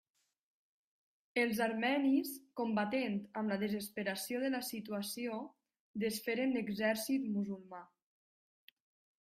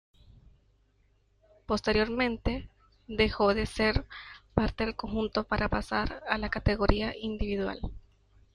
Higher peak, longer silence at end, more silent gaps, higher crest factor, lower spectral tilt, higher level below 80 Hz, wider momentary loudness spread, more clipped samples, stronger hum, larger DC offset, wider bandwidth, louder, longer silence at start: second, -20 dBFS vs -8 dBFS; first, 1.35 s vs 0.55 s; first, 5.80-5.94 s vs none; second, 18 dB vs 24 dB; second, -4.5 dB/octave vs -6 dB/octave; second, -80 dBFS vs -40 dBFS; about the same, 10 LU vs 8 LU; neither; neither; neither; first, 15.5 kHz vs 11 kHz; second, -37 LUFS vs -30 LUFS; second, 1.35 s vs 1.7 s